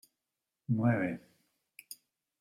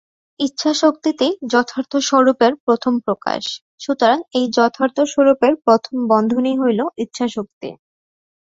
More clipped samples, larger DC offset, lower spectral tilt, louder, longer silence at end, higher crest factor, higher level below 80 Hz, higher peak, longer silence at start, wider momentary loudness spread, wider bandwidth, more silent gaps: neither; neither; first, -8 dB/octave vs -4 dB/octave; second, -32 LUFS vs -17 LUFS; second, 0.45 s vs 0.8 s; about the same, 20 dB vs 16 dB; second, -76 dBFS vs -62 dBFS; second, -16 dBFS vs -2 dBFS; first, 0.7 s vs 0.4 s; first, 21 LU vs 10 LU; first, 15.5 kHz vs 7.8 kHz; second, none vs 2.60-2.67 s, 3.61-3.78 s, 7.53-7.61 s